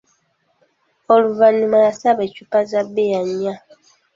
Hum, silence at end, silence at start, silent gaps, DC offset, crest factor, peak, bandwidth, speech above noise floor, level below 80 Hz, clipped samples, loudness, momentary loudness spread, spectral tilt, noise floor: none; 0.6 s; 1.1 s; none; under 0.1%; 16 dB; -2 dBFS; 7.6 kHz; 48 dB; -66 dBFS; under 0.1%; -17 LUFS; 10 LU; -6 dB/octave; -64 dBFS